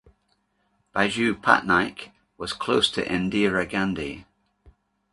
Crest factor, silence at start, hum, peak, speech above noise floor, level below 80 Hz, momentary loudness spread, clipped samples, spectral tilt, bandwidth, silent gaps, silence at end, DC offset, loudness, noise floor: 26 dB; 0.95 s; none; 0 dBFS; 46 dB; -52 dBFS; 16 LU; under 0.1%; -4.5 dB/octave; 11.5 kHz; none; 0.9 s; under 0.1%; -23 LUFS; -70 dBFS